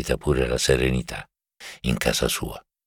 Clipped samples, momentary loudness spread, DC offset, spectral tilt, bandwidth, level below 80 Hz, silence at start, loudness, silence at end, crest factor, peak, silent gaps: under 0.1%; 16 LU; under 0.1%; -4 dB/octave; 19 kHz; -34 dBFS; 0 s; -23 LUFS; 0.25 s; 20 dB; -6 dBFS; none